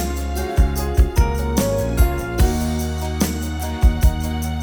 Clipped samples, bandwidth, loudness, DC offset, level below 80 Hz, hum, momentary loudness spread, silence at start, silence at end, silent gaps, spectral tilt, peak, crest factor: under 0.1%; over 20 kHz; -20 LUFS; under 0.1%; -20 dBFS; none; 6 LU; 0 s; 0 s; none; -6 dB/octave; -4 dBFS; 16 dB